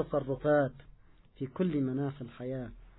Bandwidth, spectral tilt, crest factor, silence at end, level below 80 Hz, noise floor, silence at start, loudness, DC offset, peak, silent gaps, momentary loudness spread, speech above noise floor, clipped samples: 3.9 kHz; -5.5 dB/octave; 16 dB; 0.1 s; -56 dBFS; -58 dBFS; 0 s; -33 LUFS; under 0.1%; -18 dBFS; none; 13 LU; 26 dB; under 0.1%